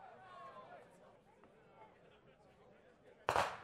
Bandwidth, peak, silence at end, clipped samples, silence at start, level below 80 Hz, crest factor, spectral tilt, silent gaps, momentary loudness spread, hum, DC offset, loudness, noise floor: 15 kHz; -16 dBFS; 0 s; under 0.1%; 0 s; -72 dBFS; 32 dB; -3 dB/octave; none; 28 LU; none; under 0.1%; -43 LUFS; -66 dBFS